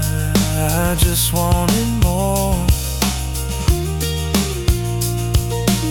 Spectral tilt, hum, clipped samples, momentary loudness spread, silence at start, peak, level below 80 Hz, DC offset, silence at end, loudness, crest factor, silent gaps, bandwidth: -4.5 dB/octave; none; under 0.1%; 4 LU; 0 s; -2 dBFS; -22 dBFS; under 0.1%; 0 s; -18 LUFS; 16 dB; none; 19 kHz